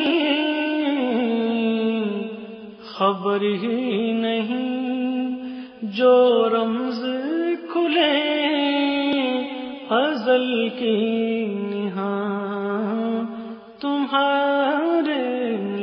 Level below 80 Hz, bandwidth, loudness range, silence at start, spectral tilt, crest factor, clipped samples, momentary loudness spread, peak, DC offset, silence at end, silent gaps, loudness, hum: -72 dBFS; 5.6 kHz; 4 LU; 0 s; -8 dB/octave; 16 dB; under 0.1%; 10 LU; -6 dBFS; under 0.1%; 0 s; none; -22 LUFS; none